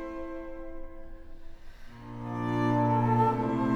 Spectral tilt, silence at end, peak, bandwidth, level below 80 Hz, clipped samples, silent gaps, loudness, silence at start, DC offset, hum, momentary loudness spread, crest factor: -9 dB/octave; 0 s; -14 dBFS; 6.8 kHz; -46 dBFS; under 0.1%; none; -28 LUFS; 0 s; under 0.1%; none; 22 LU; 16 dB